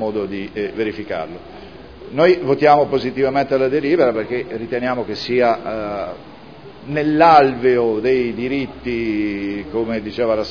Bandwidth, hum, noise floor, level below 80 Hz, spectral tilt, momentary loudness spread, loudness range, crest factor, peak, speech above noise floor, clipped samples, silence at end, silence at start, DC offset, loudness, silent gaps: 5.4 kHz; none; -39 dBFS; -48 dBFS; -7.5 dB/octave; 14 LU; 3 LU; 18 dB; 0 dBFS; 21 dB; under 0.1%; 0 s; 0 s; 0.4%; -18 LUFS; none